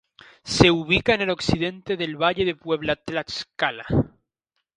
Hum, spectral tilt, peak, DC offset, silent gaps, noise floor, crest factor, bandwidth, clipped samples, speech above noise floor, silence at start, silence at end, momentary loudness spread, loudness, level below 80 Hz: none; -5 dB/octave; 0 dBFS; under 0.1%; none; -78 dBFS; 24 dB; 11 kHz; under 0.1%; 56 dB; 0.45 s; 0.7 s; 11 LU; -23 LUFS; -44 dBFS